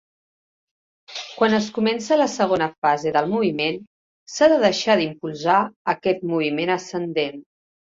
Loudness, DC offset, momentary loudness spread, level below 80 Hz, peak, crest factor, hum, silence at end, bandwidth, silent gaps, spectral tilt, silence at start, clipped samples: -21 LUFS; under 0.1%; 9 LU; -64 dBFS; -4 dBFS; 18 dB; none; 0.55 s; 7.8 kHz; 2.78-2.82 s, 3.87-4.26 s, 5.76-5.85 s; -4.5 dB/octave; 1.1 s; under 0.1%